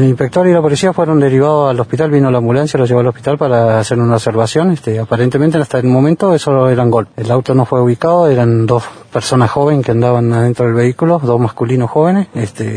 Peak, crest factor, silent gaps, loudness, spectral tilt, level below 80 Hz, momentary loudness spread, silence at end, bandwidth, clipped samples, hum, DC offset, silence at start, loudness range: 0 dBFS; 10 dB; none; -12 LUFS; -7.5 dB/octave; -48 dBFS; 4 LU; 0 s; 10.5 kHz; under 0.1%; none; under 0.1%; 0 s; 1 LU